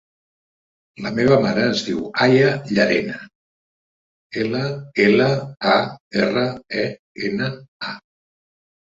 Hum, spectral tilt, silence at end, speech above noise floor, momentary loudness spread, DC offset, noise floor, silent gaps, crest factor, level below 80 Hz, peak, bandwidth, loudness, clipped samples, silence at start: none; -6 dB/octave; 0.95 s; over 71 dB; 15 LU; under 0.1%; under -90 dBFS; 3.35-4.30 s, 6.00-6.11 s, 6.99-7.15 s, 7.68-7.80 s; 18 dB; -56 dBFS; -2 dBFS; 7.8 kHz; -19 LUFS; under 0.1%; 1 s